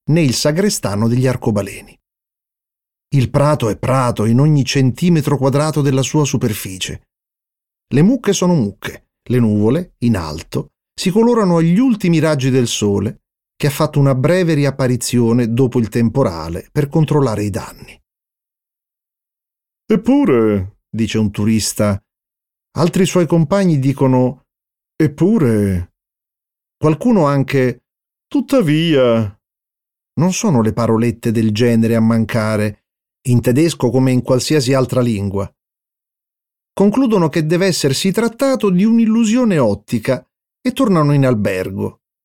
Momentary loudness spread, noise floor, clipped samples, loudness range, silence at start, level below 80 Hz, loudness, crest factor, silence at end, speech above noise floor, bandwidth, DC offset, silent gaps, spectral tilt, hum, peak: 10 LU; -87 dBFS; under 0.1%; 3 LU; 0.1 s; -46 dBFS; -15 LUFS; 14 dB; 0.35 s; 72 dB; 17 kHz; under 0.1%; none; -6.5 dB/octave; none; -2 dBFS